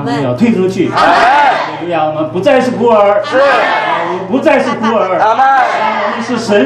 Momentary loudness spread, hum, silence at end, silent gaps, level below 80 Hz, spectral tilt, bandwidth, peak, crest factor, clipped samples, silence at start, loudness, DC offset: 7 LU; none; 0 s; none; -50 dBFS; -5.5 dB/octave; 12 kHz; 0 dBFS; 10 dB; 0.3%; 0 s; -10 LUFS; under 0.1%